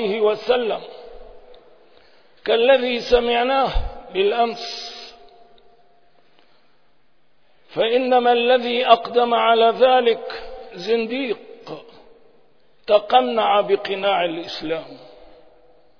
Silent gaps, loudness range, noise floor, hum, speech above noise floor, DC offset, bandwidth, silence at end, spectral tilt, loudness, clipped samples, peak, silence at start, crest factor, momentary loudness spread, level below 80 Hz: none; 10 LU; -65 dBFS; none; 46 dB; 0.3%; 5.4 kHz; 0.95 s; -5 dB/octave; -19 LUFS; under 0.1%; 0 dBFS; 0 s; 20 dB; 18 LU; -40 dBFS